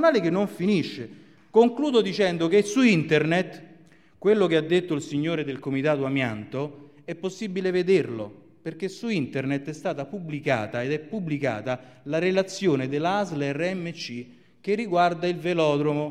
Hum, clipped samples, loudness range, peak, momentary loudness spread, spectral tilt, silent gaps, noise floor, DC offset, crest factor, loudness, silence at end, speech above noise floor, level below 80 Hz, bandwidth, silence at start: none; under 0.1%; 6 LU; -6 dBFS; 13 LU; -6 dB/octave; none; -54 dBFS; 0.1%; 20 dB; -25 LUFS; 0 s; 30 dB; -66 dBFS; 12.5 kHz; 0 s